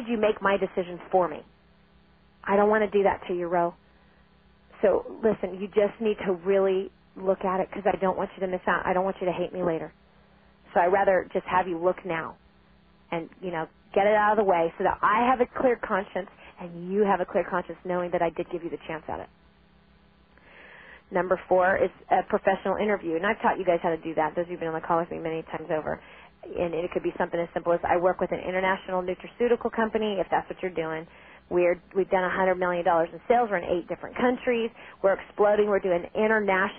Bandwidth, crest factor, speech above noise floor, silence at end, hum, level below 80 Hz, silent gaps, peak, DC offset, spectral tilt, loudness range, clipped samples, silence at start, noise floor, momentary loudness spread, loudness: 3.8 kHz; 18 dB; 33 dB; 0 s; none; -56 dBFS; none; -8 dBFS; under 0.1%; -10 dB/octave; 4 LU; under 0.1%; 0 s; -59 dBFS; 11 LU; -26 LUFS